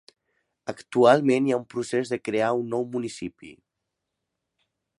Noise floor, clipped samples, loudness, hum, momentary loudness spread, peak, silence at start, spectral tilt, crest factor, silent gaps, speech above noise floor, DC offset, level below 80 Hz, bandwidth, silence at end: -83 dBFS; under 0.1%; -24 LUFS; none; 19 LU; -4 dBFS; 0.65 s; -6 dB/octave; 22 dB; none; 59 dB; under 0.1%; -70 dBFS; 11.5 kHz; 1.45 s